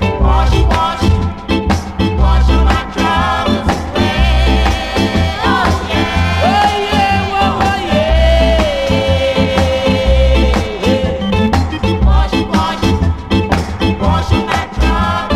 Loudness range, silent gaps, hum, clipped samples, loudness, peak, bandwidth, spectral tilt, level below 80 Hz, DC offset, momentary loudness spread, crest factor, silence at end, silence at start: 2 LU; none; none; under 0.1%; -13 LUFS; 0 dBFS; 12.5 kHz; -6 dB/octave; -16 dBFS; under 0.1%; 4 LU; 12 dB; 0 s; 0 s